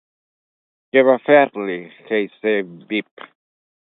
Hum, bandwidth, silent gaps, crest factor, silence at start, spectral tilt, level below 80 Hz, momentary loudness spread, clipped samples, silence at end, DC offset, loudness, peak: none; 4 kHz; none; 20 dB; 0.95 s; -9.5 dB/octave; -74 dBFS; 12 LU; under 0.1%; 0.9 s; under 0.1%; -18 LUFS; 0 dBFS